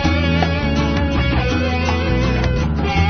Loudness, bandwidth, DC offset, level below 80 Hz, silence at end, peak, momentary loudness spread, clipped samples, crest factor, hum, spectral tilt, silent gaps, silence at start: -18 LUFS; 6.6 kHz; under 0.1%; -22 dBFS; 0 s; -2 dBFS; 2 LU; under 0.1%; 14 dB; none; -6.5 dB/octave; none; 0 s